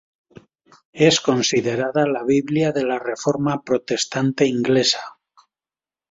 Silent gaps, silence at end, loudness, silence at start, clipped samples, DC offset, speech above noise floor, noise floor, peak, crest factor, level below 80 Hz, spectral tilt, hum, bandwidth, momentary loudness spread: none; 1 s; -20 LUFS; 0.95 s; under 0.1%; under 0.1%; over 71 dB; under -90 dBFS; -2 dBFS; 18 dB; -60 dBFS; -4.5 dB/octave; none; 8 kHz; 6 LU